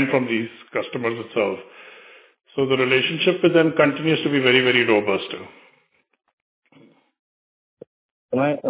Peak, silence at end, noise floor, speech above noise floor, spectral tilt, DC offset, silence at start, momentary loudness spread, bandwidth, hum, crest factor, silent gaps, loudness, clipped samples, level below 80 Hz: -2 dBFS; 0 s; -63 dBFS; 43 dB; -9 dB/octave; under 0.1%; 0 s; 12 LU; 4 kHz; none; 20 dB; 6.33-6.62 s, 7.19-7.77 s, 7.87-8.29 s; -20 LUFS; under 0.1%; -68 dBFS